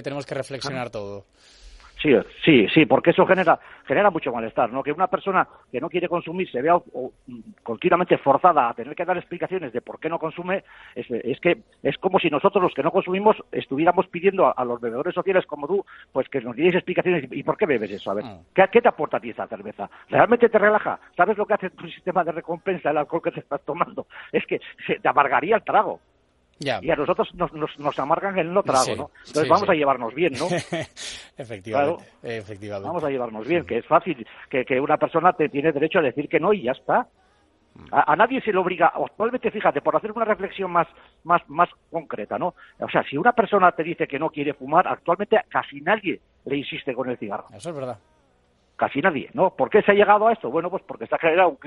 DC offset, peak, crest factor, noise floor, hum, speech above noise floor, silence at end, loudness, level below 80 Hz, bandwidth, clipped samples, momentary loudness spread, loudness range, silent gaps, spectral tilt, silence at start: under 0.1%; 0 dBFS; 22 dB; -63 dBFS; none; 40 dB; 0.1 s; -22 LUFS; -60 dBFS; 11.5 kHz; under 0.1%; 14 LU; 5 LU; none; -5.5 dB/octave; 0 s